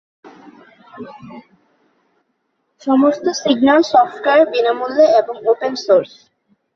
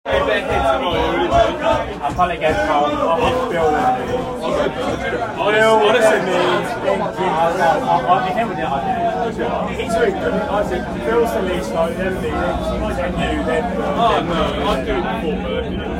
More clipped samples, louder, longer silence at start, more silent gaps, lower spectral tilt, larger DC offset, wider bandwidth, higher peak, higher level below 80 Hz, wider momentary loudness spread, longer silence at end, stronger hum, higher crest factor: neither; first, -14 LUFS vs -18 LUFS; first, 0.95 s vs 0.05 s; neither; second, -4 dB/octave vs -5.5 dB/octave; neither; second, 7.2 kHz vs 16 kHz; about the same, 0 dBFS vs -2 dBFS; second, -62 dBFS vs -34 dBFS; first, 22 LU vs 6 LU; first, 0.7 s vs 0 s; neither; about the same, 16 dB vs 16 dB